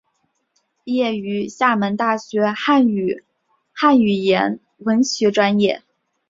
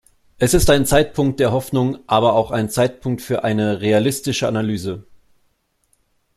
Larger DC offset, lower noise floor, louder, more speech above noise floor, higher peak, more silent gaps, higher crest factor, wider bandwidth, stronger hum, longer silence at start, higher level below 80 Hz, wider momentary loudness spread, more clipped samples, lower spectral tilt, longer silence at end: neither; first, -69 dBFS vs -65 dBFS; about the same, -18 LUFS vs -18 LUFS; first, 51 dB vs 47 dB; about the same, -2 dBFS vs 0 dBFS; neither; about the same, 18 dB vs 18 dB; second, 7.8 kHz vs 15.5 kHz; neither; first, 0.85 s vs 0.4 s; second, -62 dBFS vs -36 dBFS; about the same, 10 LU vs 8 LU; neither; about the same, -5 dB/octave vs -5 dB/octave; second, 0.5 s vs 1.35 s